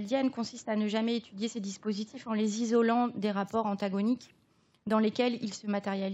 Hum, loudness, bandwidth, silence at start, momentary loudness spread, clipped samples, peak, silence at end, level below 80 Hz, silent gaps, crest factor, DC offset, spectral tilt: none; -31 LUFS; 8.2 kHz; 0 s; 9 LU; under 0.1%; -14 dBFS; 0 s; -80 dBFS; none; 16 dB; under 0.1%; -5.5 dB/octave